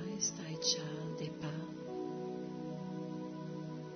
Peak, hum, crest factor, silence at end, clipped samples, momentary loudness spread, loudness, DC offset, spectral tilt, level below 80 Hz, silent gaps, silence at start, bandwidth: -20 dBFS; none; 22 dB; 0 s; under 0.1%; 10 LU; -40 LUFS; under 0.1%; -4.5 dB/octave; -76 dBFS; none; 0 s; 6.4 kHz